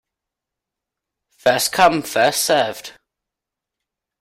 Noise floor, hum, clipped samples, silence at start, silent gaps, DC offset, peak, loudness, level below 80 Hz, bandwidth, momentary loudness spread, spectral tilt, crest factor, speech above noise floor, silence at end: -85 dBFS; none; under 0.1%; 1.45 s; none; under 0.1%; -2 dBFS; -17 LUFS; -58 dBFS; 16 kHz; 13 LU; -2.5 dB/octave; 20 dB; 68 dB; 1.3 s